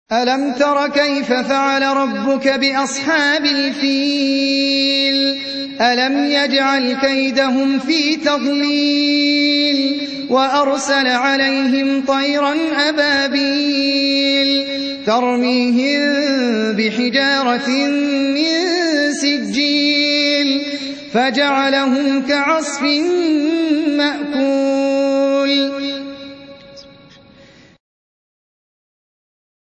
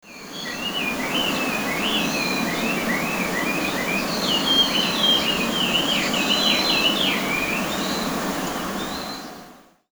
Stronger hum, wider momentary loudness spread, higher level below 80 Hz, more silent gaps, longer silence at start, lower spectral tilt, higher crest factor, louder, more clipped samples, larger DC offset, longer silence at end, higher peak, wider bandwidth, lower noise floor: neither; second, 4 LU vs 10 LU; second, -62 dBFS vs -50 dBFS; neither; about the same, 0.1 s vs 0.05 s; about the same, -3 dB/octave vs -2.5 dB/octave; about the same, 14 dB vs 18 dB; first, -15 LUFS vs -21 LUFS; neither; neither; first, 2.9 s vs 0.3 s; first, -2 dBFS vs -6 dBFS; second, 9 kHz vs over 20 kHz; about the same, -45 dBFS vs -47 dBFS